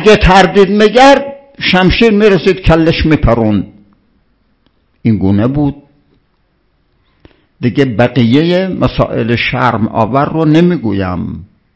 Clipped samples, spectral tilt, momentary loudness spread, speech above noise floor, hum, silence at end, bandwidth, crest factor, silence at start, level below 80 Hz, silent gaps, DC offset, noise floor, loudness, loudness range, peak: 3%; -6.5 dB/octave; 11 LU; 48 dB; none; 0.3 s; 8 kHz; 10 dB; 0 s; -26 dBFS; none; under 0.1%; -57 dBFS; -10 LUFS; 9 LU; 0 dBFS